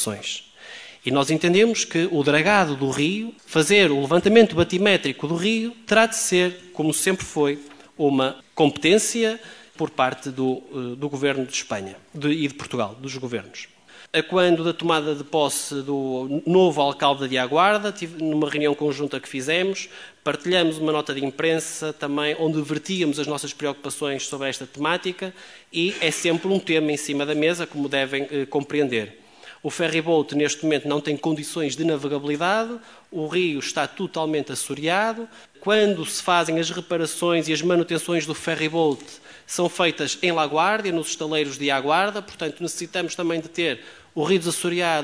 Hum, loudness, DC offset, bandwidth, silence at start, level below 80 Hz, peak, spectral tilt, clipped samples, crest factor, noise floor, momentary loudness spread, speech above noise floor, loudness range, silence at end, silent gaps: none; -22 LUFS; under 0.1%; 11 kHz; 0 s; -62 dBFS; 0 dBFS; -4 dB/octave; under 0.1%; 22 dB; -42 dBFS; 11 LU; 20 dB; 6 LU; 0 s; none